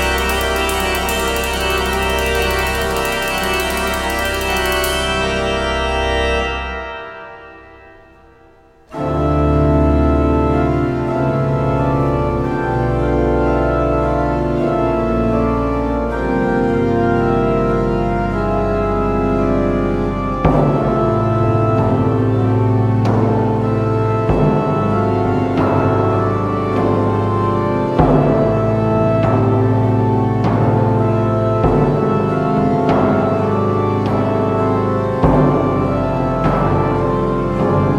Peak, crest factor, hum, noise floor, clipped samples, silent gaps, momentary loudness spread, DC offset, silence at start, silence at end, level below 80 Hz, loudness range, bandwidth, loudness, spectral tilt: 0 dBFS; 14 dB; none; -47 dBFS; under 0.1%; none; 4 LU; under 0.1%; 0 s; 0 s; -26 dBFS; 3 LU; 16.5 kHz; -16 LUFS; -6.5 dB/octave